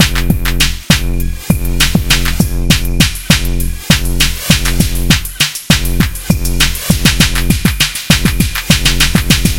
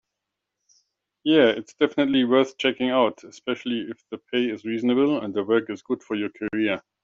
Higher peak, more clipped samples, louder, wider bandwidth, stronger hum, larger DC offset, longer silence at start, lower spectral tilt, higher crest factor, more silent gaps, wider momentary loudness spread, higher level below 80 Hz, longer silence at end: first, 0 dBFS vs -4 dBFS; first, 0.8% vs under 0.1%; first, -12 LUFS vs -23 LUFS; first, 17.5 kHz vs 7.6 kHz; neither; first, 6% vs under 0.1%; second, 0 s vs 1.25 s; about the same, -3.5 dB/octave vs -3 dB/octave; second, 12 dB vs 20 dB; neither; second, 5 LU vs 11 LU; first, -18 dBFS vs -66 dBFS; second, 0 s vs 0.25 s